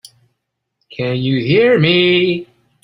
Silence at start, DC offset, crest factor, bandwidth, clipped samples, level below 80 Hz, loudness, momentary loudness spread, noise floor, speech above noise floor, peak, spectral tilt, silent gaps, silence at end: 0.9 s; under 0.1%; 16 dB; 11 kHz; under 0.1%; -54 dBFS; -14 LUFS; 13 LU; -73 dBFS; 59 dB; 0 dBFS; -7.5 dB/octave; none; 0.4 s